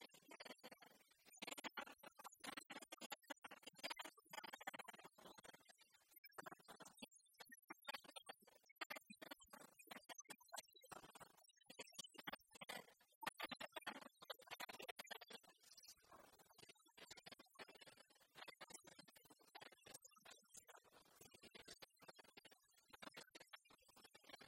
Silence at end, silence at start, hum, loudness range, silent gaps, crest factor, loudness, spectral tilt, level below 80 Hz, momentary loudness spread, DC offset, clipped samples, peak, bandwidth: 0 s; 0 s; none; 9 LU; 3.06-3.10 s, 6.18-6.24 s, 7.64-7.68 s, 8.72-8.76 s, 8.86-8.90 s, 13.15-13.21 s, 14.91-14.96 s; 28 dB; -58 LUFS; -1.5 dB/octave; under -90 dBFS; 13 LU; under 0.1%; under 0.1%; -32 dBFS; 16 kHz